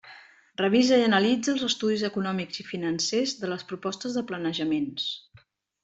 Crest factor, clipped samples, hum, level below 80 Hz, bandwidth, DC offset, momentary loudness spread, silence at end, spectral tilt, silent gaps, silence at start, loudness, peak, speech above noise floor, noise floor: 18 dB; under 0.1%; none; -68 dBFS; 8.2 kHz; under 0.1%; 12 LU; 0.65 s; -4 dB/octave; none; 0.05 s; -26 LUFS; -10 dBFS; 33 dB; -59 dBFS